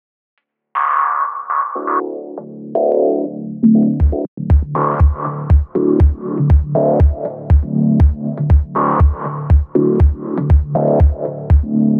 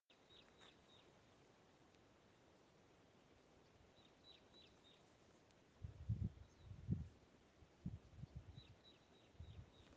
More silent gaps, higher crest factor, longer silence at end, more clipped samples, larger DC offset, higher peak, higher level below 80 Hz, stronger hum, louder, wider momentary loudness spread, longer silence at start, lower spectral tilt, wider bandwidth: first, 4.28-4.37 s vs none; second, 12 dB vs 26 dB; about the same, 0 s vs 0 s; neither; neither; first, -2 dBFS vs -30 dBFS; first, -18 dBFS vs -68 dBFS; neither; first, -15 LUFS vs -54 LUFS; second, 9 LU vs 19 LU; first, 0.75 s vs 0.1 s; first, -12 dB/octave vs -7 dB/octave; second, 2.9 kHz vs 8 kHz